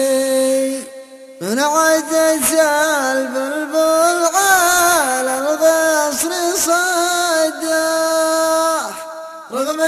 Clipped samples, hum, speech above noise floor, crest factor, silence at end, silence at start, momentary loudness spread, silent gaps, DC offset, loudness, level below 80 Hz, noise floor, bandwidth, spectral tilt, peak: under 0.1%; none; 21 dB; 16 dB; 0 s; 0 s; 10 LU; none; under 0.1%; -15 LUFS; -58 dBFS; -36 dBFS; 15 kHz; -1 dB/octave; 0 dBFS